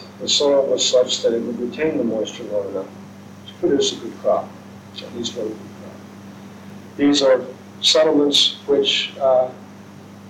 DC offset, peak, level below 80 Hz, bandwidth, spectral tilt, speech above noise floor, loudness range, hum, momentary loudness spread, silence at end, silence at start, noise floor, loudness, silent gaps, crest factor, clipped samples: under 0.1%; -4 dBFS; -64 dBFS; 15.5 kHz; -3 dB/octave; 21 dB; 8 LU; none; 24 LU; 0 s; 0 s; -40 dBFS; -18 LUFS; none; 16 dB; under 0.1%